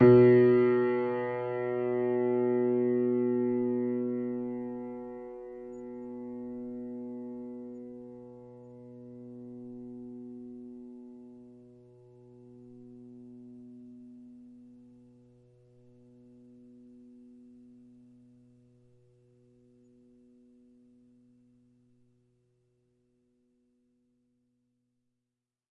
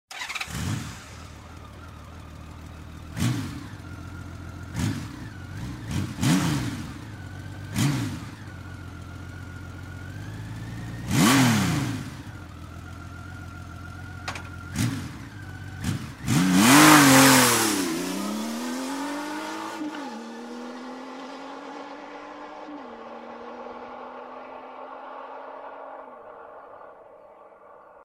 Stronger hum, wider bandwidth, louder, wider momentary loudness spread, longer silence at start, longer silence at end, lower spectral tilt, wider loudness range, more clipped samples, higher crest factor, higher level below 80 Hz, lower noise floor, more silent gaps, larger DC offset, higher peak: neither; second, 4.6 kHz vs 16 kHz; second, -29 LUFS vs -22 LUFS; about the same, 23 LU vs 22 LU; about the same, 0 s vs 0.1 s; first, 11.2 s vs 0 s; first, -11 dB/octave vs -4 dB/octave; first, 27 LU vs 22 LU; neither; about the same, 24 dB vs 26 dB; second, -68 dBFS vs -50 dBFS; first, -88 dBFS vs -49 dBFS; neither; neither; second, -10 dBFS vs -2 dBFS